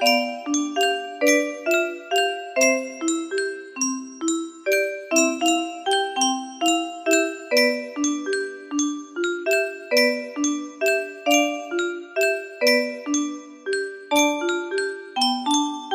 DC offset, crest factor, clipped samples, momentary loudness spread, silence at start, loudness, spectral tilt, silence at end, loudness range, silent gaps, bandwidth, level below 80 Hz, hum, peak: under 0.1%; 18 dB; under 0.1%; 7 LU; 0 s; -22 LUFS; 0 dB/octave; 0 s; 2 LU; none; 15.5 kHz; -72 dBFS; none; -4 dBFS